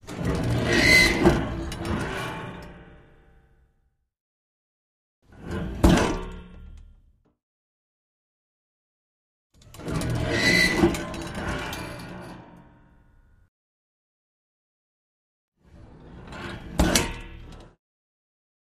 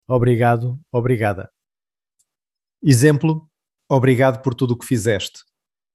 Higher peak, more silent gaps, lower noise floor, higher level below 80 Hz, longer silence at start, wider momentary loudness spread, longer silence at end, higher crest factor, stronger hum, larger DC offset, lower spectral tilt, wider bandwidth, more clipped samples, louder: about the same, -4 dBFS vs -2 dBFS; first, 4.20-5.22 s, 7.43-9.50 s, 13.48-15.52 s vs none; second, -70 dBFS vs under -90 dBFS; first, -38 dBFS vs -50 dBFS; about the same, 0.05 s vs 0.1 s; first, 24 LU vs 9 LU; first, 1.1 s vs 0.65 s; first, 26 dB vs 18 dB; neither; neither; second, -4.5 dB/octave vs -6.5 dB/octave; first, 15.5 kHz vs 13 kHz; neither; second, -23 LUFS vs -18 LUFS